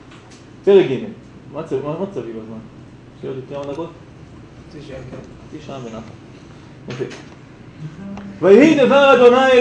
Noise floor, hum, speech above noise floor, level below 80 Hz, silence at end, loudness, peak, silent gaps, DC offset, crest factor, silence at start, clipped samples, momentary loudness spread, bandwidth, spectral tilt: -41 dBFS; none; 25 dB; -52 dBFS; 0 s; -14 LUFS; 0 dBFS; none; under 0.1%; 18 dB; 0.65 s; under 0.1%; 26 LU; 8.6 kHz; -6 dB/octave